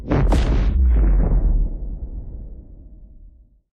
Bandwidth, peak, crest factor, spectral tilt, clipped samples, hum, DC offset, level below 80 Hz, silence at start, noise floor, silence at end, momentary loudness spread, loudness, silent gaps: 6.8 kHz; -4 dBFS; 14 dB; -8 dB/octave; under 0.1%; none; under 0.1%; -20 dBFS; 0 s; -47 dBFS; 0.45 s; 19 LU; -20 LUFS; none